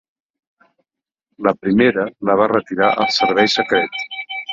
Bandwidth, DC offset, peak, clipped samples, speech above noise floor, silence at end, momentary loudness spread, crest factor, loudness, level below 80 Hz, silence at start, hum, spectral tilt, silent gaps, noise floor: 7.8 kHz; under 0.1%; -2 dBFS; under 0.1%; 67 dB; 0 s; 8 LU; 16 dB; -17 LUFS; -58 dBFS; 1.4 s; none; -4.5 dB/octave; none; -84 dBFS